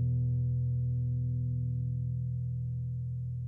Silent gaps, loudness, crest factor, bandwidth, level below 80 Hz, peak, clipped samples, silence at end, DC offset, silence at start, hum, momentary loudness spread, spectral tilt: none; -33 LUFS; 8 dB; 0.6 kHz; -46 dBFS; -24 dBFS; under 0.1%; 0 s; under 0.1%; 0 s; none; 5 LU; -13.5 dB/octave